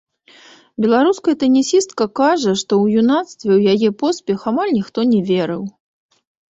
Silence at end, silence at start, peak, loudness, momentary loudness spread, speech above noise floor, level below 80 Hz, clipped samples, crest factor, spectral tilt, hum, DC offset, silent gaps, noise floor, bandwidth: 0.8 s; 0.8 s; -2 dBFS; -16 LUFS; 7 LU; 31 dB; -60 dBFS; under 0.1%; 14 dB; -5.5 dB/octave; none; under 0.1%; none; -46 dBFS; 8.2 kHz